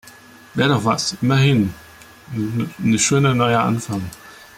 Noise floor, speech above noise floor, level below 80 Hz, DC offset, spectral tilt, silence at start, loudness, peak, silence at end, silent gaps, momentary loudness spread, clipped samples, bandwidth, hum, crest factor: -44 dBFS; 26 dB; -52 dBFS; under 0.1%; -5 dB/octave; 0.55 s; -18 LUFS; -4 dBFS; 0.25 s; none; 13 LU; under 0.1%; 16 kHz; none; 16 dB